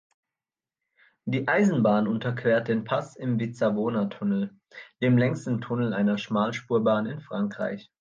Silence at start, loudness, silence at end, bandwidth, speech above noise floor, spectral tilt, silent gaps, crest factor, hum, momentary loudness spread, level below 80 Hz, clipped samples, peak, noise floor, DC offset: 1.25 s; -26 LUFS; 0.2 s; 7.6 kHz; over 65 dB; -7.5 dB/octave; none; 16 dB; none; 9 LU; -70 dBFS; under 0.1%; -10 dBFS; under -90 dBFS; under 0.1%